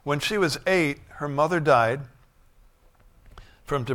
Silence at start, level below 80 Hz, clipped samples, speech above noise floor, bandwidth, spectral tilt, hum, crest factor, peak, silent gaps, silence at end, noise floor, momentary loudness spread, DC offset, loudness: 0.05 s; -52 dBFS; under 0.1%; 33 dB; 18 kHz; -5 dB/octave; none; 20 dB; -6 dBFS; none; 0 s; -56 dBFS; 13 LU; under 0.1%; -24 LUFS